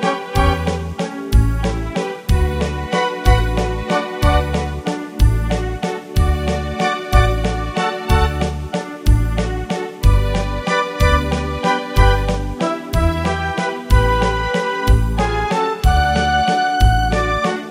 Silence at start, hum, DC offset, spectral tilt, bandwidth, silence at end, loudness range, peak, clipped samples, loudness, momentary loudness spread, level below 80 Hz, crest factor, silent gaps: 0 s; none; under 0.1%; -6 dB/octave; 15.5 kHz; 0 s; 2 LU; -2 dBFS; under 0.1%; -18 LUFS; 7 LU; -20 dBFS; 16 dB; none